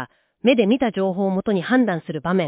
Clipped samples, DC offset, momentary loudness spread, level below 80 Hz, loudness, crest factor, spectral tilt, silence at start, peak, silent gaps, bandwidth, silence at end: under 0.1%; under 0.1%; 5 LU; -58 dBFS; -20 LUFS; 16 dB; -11 dB/octave; 0 s; -4 dBFS; none; 4 kHz; 0 s